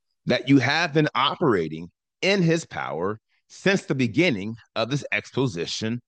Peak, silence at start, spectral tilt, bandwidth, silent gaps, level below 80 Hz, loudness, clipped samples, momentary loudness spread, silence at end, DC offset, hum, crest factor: -6 dBFS; 0.25 s; -5.5 dB/octave; 9.2 kHz; none; -66 dBFS; -23 LUFS; under 0.1%; 11 LU; 0.1 s; under 0.1%; none; 18 dB